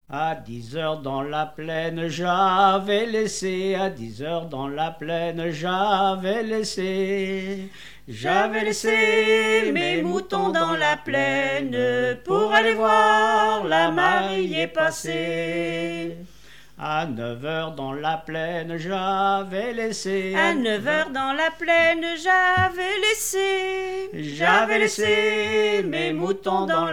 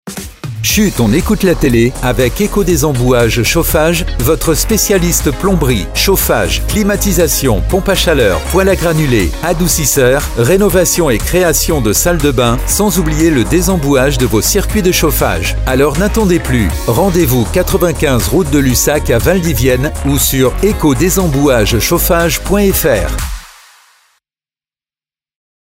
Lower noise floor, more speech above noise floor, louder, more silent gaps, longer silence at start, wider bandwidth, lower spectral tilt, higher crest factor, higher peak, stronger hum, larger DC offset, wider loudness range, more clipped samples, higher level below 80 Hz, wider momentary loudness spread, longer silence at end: second, -50 dBFS vs under -90 dBFS; second, 27 dB vs over 79 dB; second, -22 LUFS vs -11 LUFS; neither; about the same, 0.1 s vs 0.05 s; first, 18.5 kHz vs 16.5 kHz; about the same, -4 dB/octave vs -4.5 dB/octave; about the same, 16 dB vs 12 dB; second, -6 dBFS vs 0 dBFS; neither; first, 0.5% vs under 0.1%; first, 7 LU vs 1 LU; neither; second, -56 dBFS vs -20 dBFS; first, 11 LU vs 3 LU; second, 0 s vs 2.15 s